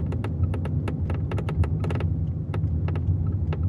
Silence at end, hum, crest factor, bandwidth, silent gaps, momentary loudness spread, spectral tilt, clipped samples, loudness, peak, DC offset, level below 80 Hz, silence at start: 0 s; none; 14 dB; 4.6 kHz; none; 2 LU; -9.5 dB/octave; under 0.1%; -27 LUFS; -12 dBFS; under 0.1%; -36 dBFS; 0 s